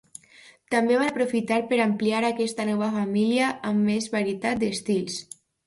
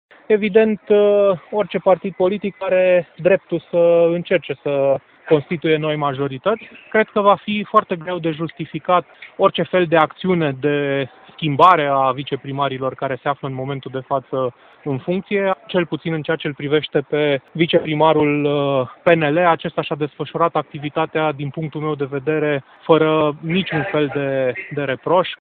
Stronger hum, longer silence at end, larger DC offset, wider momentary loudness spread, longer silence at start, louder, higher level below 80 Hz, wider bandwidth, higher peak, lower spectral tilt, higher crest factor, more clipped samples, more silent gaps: neither; first, 0.45 s vs 0.05 s; neither; second, 5 LU vs 10 LU; first, 0.7 s vs 0.3 s; second, -24 LUFS vs -18 LUFS; second, -66 dBFS vs -60 dBFS; first, 11.5 kHz vs 4.6 kHz; second, -8 dBFS vs 0 dBFS; second, -5 dB/octave vs -9 dB/octave; about the same, 16 dB vs 18 dB; neither; neither